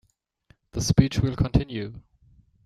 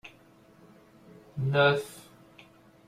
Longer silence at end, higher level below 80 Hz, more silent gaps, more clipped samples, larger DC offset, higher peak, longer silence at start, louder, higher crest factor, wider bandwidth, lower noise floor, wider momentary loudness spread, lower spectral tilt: second, 0.65 s vs 0.85 s; first, -38 dBFS vs -68 dBFS; neither; neither; neither; first, -4 dBFS vs -12 dBFS; first, 0.75 s vs 0.05 s; about the same, -24 LUFS vs -26 LUFS; about the same, 22 dB vs 20 dB; second, 14 kHz vs 15.5 kHz; first, -62 dBFS vs -58 dBFS; second, 15 LU vs 26 LU; about the same, -6 dB/octave vs -6 dB/octave